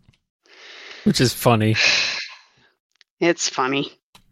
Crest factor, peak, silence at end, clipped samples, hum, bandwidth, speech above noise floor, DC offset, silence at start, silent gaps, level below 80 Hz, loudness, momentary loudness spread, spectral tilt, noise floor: 20 dB; -4 dBFS; 0.4 s; under 0.1%; none; 16 kHz; 29 dB; under 0.1%; 0.65 s; 2.80-2.90 s, 3.10-3.17 s; -54 dBFS; -19 LUFS; 17 LU; -4 dB/octave; -48 dBFS